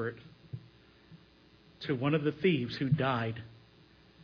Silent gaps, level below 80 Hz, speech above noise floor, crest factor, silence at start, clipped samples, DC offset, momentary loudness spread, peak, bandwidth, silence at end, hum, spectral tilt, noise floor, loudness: none; -66 dBFS; 30 dB; 18 dB; 0 s; under 0.1%; under 0.1%; 19 LU; -16 dBFS; 5.4 kHz; 0.7 s; none; -8.5 dB/octave; -61 dBFS; -32 LUFS